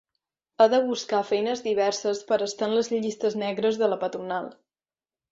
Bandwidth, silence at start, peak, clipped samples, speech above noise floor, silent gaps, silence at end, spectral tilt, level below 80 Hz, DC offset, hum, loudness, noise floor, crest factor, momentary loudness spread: 7.8 kHz; 0.6 s; -6 dBFS; under 0.1%; over 65 dB; none; 0.8 s; -4 dB/octave; -72 dBFS; under 0.1%; none; -25 LUFS; under -90 dBFS; 20 dB; 9 LU